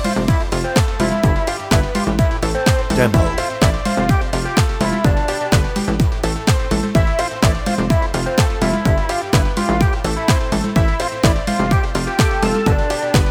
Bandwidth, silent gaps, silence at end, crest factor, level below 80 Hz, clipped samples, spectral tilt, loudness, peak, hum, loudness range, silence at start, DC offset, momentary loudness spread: over 20 kHz; none; 0 s; 14 dB; -22 dBFS; under 0.1%; -5.5 dB/octave; -17 LUFS; -2 dBFS; none; 1 LU; 0 s; under 0.1%; 2 LU